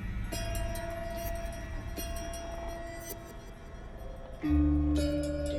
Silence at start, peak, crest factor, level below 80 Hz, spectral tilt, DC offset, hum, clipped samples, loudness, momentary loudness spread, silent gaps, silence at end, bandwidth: 0 s; -18 dBFS; 16 dB; -38 dBFS; -6 dB/octave; under 0.1%; none; under 0.1%; -34 LUFS; 18 LU; none; 0 s; 18.5 kHz